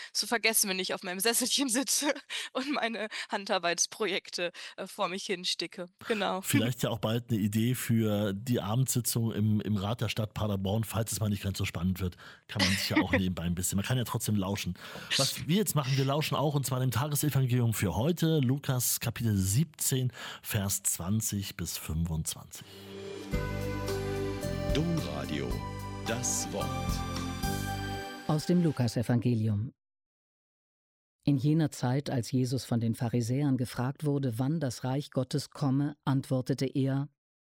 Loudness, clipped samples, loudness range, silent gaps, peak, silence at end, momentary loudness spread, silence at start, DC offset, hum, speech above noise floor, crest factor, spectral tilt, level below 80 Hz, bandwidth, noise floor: -30 LUFS; under 0.1%; 4 LU; 30.06-31.19 s; -12 dBFS; 0.35 s; 8 LU; 0 s; under 0.1%; none; over 60 dB; 18 dB; -4.5 dB/octave; -50 dBFS; 17.5 kHz; under -90 dBFS